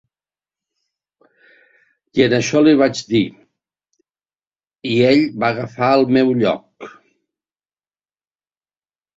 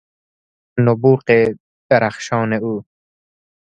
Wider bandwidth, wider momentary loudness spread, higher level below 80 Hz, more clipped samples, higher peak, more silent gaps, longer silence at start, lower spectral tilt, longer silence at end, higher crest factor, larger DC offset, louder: second, 7.8 kHz vs 8.8 kHz; about the same, 14 LU vs 13 LU; about the same, -58 dBFS vs -58 dBFS; neither; about the same, 0 dBFS vs 0 dBFS; second, 4.47-4.51 s vs 1.60-1.89 s; first, 2.15 s vs 0.75 s; second, -5.5 dB/octave vs -7 dB/octave; first, 2.3 s vs 0.95 s; about the same, 18 dB vs 18 dB; neither; about the same, -16 LUFS vs -17 LUFS